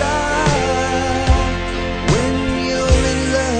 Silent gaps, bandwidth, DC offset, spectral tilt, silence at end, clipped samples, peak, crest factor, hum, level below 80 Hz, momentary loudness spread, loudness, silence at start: none; 9.4 kHz; under 0.1%; -5 dB/octave; 0 s; under 0.1%; -2 dBFS; 16 dB; none; -22 dBFS; 5 LU; -17 LUFS; 0 s